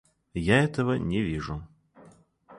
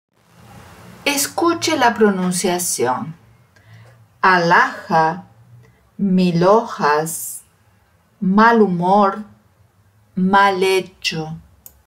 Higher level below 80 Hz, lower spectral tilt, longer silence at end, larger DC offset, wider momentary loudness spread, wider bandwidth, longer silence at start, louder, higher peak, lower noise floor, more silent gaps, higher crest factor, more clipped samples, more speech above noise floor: first, -46 dBFS vs -58 dBFS; first, -6.5 dB/octave vs -4.5 dB/octave; second, 0 s vs 0.45 s; neither; about the same, 15 LU vs 15 LU; second, 11.5 kHz vs 16 kHz; second, 0.35 s vs 0.55 s; second, -27 LUFS vs -16 LUFS; second, -8 dBFS vs -2 dBFS; about the same, -56 dBFS vs -56 dBFS; neither; about the same, 20 dB vs 16 dB; neither; second, 30 dB vs 40 dB